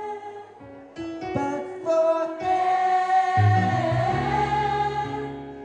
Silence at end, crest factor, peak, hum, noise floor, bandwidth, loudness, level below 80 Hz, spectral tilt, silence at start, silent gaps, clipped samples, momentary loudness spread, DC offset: 0 s; 14 dB; -8 dBFS; none; -44 dBFS; 9.4 kHz; -23 LUFS; -50 dBFS; -7 dB/octave; 0 s; none; under 0.1%; 17 LU; under 0.1%